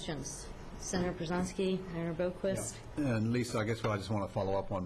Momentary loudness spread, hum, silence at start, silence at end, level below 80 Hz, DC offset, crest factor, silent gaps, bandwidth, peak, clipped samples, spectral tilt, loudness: 7 LU; none; 0 s; 0 s; -52 dBFS; under 0.1%; 12 dB; none; 13.5 kHz; -22 dBFS; under 0.1%; -5.5 dB/octave; -35 LUFS